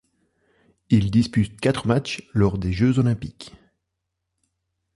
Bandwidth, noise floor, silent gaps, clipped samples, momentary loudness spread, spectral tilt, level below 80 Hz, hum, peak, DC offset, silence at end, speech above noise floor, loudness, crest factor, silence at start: 11.5 kHz; -80 dBFS; none; under 0.1%; 11 LU; -7 dB/octave; -42 dBFS; none; -4 dBFS; under 0.1%; 1.45 s; 59 dB; -22 LUFS; 18 dB; 0.9 s